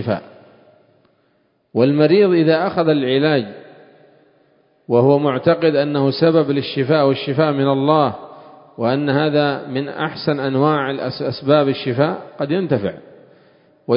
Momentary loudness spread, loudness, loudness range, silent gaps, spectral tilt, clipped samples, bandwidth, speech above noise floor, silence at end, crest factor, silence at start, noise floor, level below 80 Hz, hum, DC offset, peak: 10 LU; -17 LUFS; 3 LU; none; -11.5 dB/octave; under 0.1%; 5.4 kHz; 46 dB; 0 s; 18 dB; 0 s; -62 dBFS; -58 dBFS; none; under 0.1%; 0 dBFS